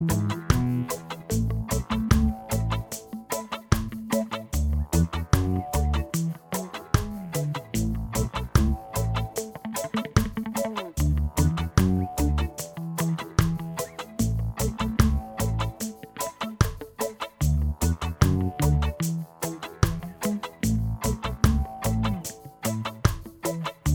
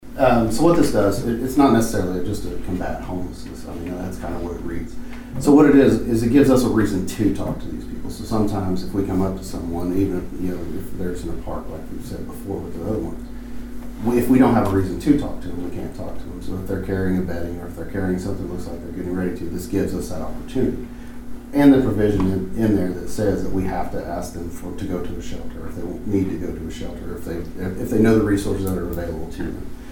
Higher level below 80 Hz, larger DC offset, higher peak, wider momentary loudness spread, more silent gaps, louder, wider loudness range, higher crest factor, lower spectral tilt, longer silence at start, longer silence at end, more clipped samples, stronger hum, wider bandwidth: about the same, -32 dBFS vs -36 dBFS; neither; about the same, -2 dBFS vs -2 dBFS; second, 9 LU vs 16 LU; neither; second, -27 LUFS vs -21 LUFS; second, 2 LU vs 10 LU; first, 24 dB vs 18 dB; second, -5.5 dB/octave vs -7 dB/octave; about the same, 0 s vs 0 s; about the same, 0 s vs 0 s; neither; neither; about the same, over 20 kHz vs 19 kHz